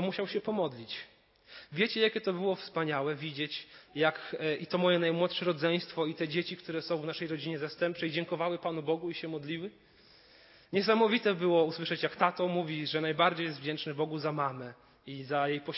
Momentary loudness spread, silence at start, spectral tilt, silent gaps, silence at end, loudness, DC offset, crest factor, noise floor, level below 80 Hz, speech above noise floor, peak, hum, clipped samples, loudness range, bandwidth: 12 LU; 0 s; -9 dB/octave; none; 0 s; -32 LUFS; under 0.1%; 22 dB; -60 dBFS; -78 dBFS; 28 dB; -10 dBFS; none; under 0.1%; 5 LU; 5.8 kHz